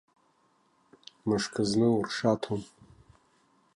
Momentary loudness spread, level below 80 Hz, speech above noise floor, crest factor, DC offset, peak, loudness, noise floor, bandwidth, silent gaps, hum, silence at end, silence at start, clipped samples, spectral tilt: 11 LU; -64 dBFS; 41 dB; 20 dB; under 0.1%; -12 dBFS; -29 LUFS; -69 dBFS; 11.5 kHz; none; none; 1.1 s; 1.25 s; under 0.1%; -5.5 dB/octave